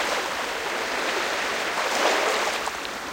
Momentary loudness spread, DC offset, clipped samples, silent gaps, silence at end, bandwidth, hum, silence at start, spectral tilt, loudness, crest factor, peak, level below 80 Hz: 6 LU; under 0.1%; under 0.1%; none; 0 s; 17 kHz; none; 0 s; -0.5 dB/octave; -25 LUFS; 18 dB; -8 dBFS; -58 dBFS